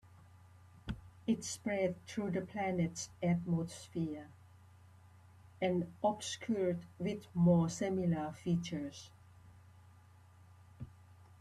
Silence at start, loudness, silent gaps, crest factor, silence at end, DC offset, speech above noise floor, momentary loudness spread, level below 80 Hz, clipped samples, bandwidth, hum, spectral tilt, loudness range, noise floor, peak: 0.05 s; -37 LUFS; none; 20 dB; 0.1 s; under 0.1%; 25 dB; 17 LU; -64 dBFS; under 0.1%; 12 kHz; none; -6 dB/octave; 5 LU; -61 dBFS; -18 dBFS